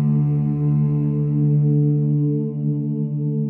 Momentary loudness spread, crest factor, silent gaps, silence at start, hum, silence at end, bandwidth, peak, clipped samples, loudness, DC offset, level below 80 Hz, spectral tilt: 6 LU; 8 dB; none; 0 s; none; 0 s; 1.4 kHz; -10 dBFS; under 0.1%; -20 LUFS; under 0.1%; -50 dBFS; -14.5 dB/octave